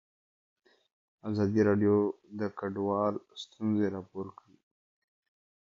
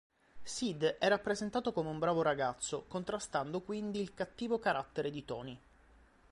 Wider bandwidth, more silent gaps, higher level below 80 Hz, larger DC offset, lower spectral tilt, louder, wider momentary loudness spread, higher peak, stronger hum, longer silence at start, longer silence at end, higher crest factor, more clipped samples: second, 7.4 kHz vs 11.5 kHz; neither; about the same, -62 dBFS vs -66 dBFS; neither; first, -8 dB/octave vs -4.5 dB/octave; first, -30 LUFS vs -36 LUFS; first, 16 LU vs 11 LU; first, -14 dBFS vs -18 dBFS; neither; first, 1.25 s vs 0.35 s; first, 1.35 s vs 0.75 s; about the same, 18 dB vs 20 dB; neither